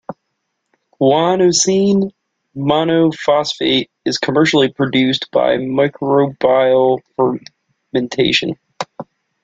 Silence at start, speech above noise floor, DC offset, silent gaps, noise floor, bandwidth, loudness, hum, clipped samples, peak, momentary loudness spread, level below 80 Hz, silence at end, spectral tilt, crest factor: 0.1 s; 58 dB; under 0.1%; none; -72 dBFS; 9.4 kHz; -15 LUFS; none; under 0.1%; 0 dBFS; 13 LU; -54 dBFS; 0.4 s; -4.5 dB/octave; 14 dB